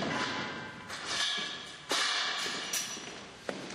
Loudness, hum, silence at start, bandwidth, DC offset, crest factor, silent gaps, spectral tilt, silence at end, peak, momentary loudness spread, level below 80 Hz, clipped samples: -33 LUFS; none; 0 s; 15.5 kHz; under 0.1%; 20 dB; none; -1 dB/octave; 0 s; -16 dBFS; 12 LU; -70 dBFS; under 0.1%